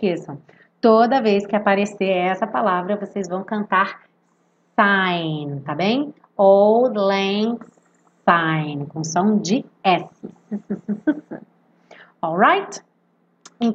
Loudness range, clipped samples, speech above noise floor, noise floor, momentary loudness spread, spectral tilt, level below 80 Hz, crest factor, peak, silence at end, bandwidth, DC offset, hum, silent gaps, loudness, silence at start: 5 LU; under 0.1%; 44 dB; -63 dBFS; 14 LU; -5.5 dB/octave; -72 dBFS; 20 dB; 0 dBFS; 0 s; 8.2 kHz; under 0.1%; none; none; -19 LUFS; 0 s